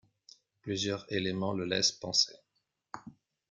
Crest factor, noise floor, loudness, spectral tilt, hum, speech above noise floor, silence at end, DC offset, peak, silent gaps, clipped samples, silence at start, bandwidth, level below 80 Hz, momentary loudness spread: 22 dB; -80 dBFS; -31 LUFS; -3 dB/octave; none; 48 dB; 0.4 s; under 0.1%; -12 dBFS; none; under 0.1%; 0.65 s; 11 kHz; -70 dBFS; 20 LU